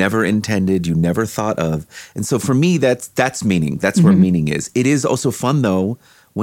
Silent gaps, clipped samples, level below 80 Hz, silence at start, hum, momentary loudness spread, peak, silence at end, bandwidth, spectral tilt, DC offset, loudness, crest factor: none; under 0.1%; -46 dBFS; 0 s; none; 8 LU; -4 dBFS; 0 s; 16.5 kHz; -6 dB/octave; under 0.1%; -17 LUFS; 14 dB